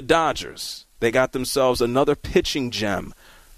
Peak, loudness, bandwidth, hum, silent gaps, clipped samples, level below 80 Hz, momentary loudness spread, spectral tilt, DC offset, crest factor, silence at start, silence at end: -6 dBFS; -22 LUFS; 14.5 kHz; none; none; under 0.1%; -42 dBFS; 11 LU; -4 dB/octave; under 0.1%; 16 dB; 0 s; 0.45 s